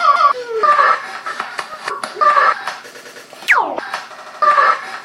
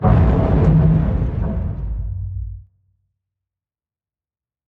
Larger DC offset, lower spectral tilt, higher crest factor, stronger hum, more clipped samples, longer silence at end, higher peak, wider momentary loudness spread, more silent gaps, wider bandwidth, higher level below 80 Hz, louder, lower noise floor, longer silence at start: neither; second, -1 dB/octave vs -11 dB/octave; about the same, 16 dB vs 16 dB; neither; neither; second, 0 s vs 2.05 s; about the same, 0 dBFS vs -2 dBFS; first, 17 LU vs 14 LU; neither; first, 16 kHz vs 4.2 kHz; second, -74 dBFS vs -24 dBFS; first, -15 LUFS vs -18 LUFS; second, -36 dBFS vs under -90 dBFS; about the same, 0 s vs 0 s